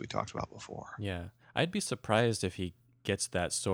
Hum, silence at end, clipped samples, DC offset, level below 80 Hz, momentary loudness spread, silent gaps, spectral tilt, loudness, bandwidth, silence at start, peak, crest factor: none; 0 s; under 0.1%; under 0.1%; -60 dBFS; 13 LU; none; -4 dB/octave; -34 LUFS; 17 kHz; 0 s; -12 dBFS; 22 dB